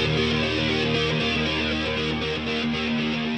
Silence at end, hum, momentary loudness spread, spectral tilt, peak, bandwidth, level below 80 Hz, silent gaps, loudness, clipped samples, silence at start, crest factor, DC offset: 0 s; none; 3 LU; -5 dB/octave; -10 dBFS; 9 kHz; -42 dBFS; none; -23 LUFS; under 0.1%; 0 s; 14 dB; 0.1%